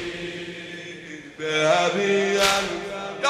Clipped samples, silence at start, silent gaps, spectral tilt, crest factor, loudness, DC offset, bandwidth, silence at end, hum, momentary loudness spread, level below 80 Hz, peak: under 0.1%; 0 s; none; -3 dB/octave; 20 dB; -22 LUFS; under 0.1%; 15.5 kHz; 0 s; none; 17 LU; -56 dBFS; -4 dBFS